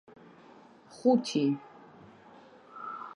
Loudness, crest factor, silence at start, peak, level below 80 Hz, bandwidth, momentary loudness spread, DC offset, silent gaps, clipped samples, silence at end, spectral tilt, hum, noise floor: -30 LUFS; 22 dB; 0.9 s; -12 dBFS; -82 dBFS; 11 kHz; 26 LU; under 0.1%; none; under 0.1%; 0 s; -6 dB/octave; none; -55 dBFS